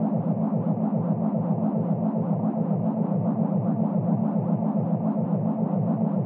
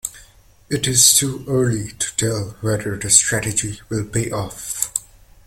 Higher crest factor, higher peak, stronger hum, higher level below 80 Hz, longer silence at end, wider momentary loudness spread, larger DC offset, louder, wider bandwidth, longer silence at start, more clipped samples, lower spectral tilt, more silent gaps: second, 12 dB vs 20 dB; second, -12 dBFS vs 0 dBFS; neither; second, -76 dBFS vs -46 dBFS; second, 0 s vs 0.45 s; second, 1 LU vs 15 LU; neither; second, -25 LUFS vs -18 LUFS; second, 2.7 kHz vs 17 kHz; about the same, 0 s vs 0.05 s; neither; first, -13.5 dB/octave vs -2.5 dB/octave; neither